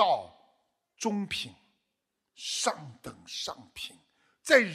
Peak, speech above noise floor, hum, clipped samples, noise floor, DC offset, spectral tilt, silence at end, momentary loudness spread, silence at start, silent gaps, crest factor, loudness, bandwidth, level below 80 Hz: -6 dBFS; 53 dB; none; under 0.1%; -83 dBFS; under 0.1%; -2.5 dB/octave; 0 s; 18 LU; 0 s; none; 26 dB; -32 LUFS; 14.5 kHz; -70 dBFS